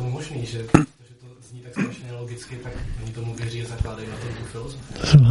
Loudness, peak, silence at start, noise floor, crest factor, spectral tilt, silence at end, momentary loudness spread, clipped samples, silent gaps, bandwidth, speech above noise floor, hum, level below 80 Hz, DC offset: -25 LUFS; 0 dBFS; 0 s; -47 dBFS; 22 dB; -6.5 dB/octave; 0 s; 16 LU; under 0.1%; none; 11.5 kHz; 25 dB; none; -38 dBFS; under 0.1%